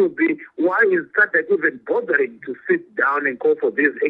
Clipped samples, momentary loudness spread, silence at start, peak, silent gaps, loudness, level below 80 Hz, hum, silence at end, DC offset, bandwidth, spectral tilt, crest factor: under 0.1%; 5 LU; 0 s; -4 dBFS; none; -19 LUFS; -72 dBFS; none; 0 s; under 0.1%; 5 kHz; -8.5 dB/octave; 16 dB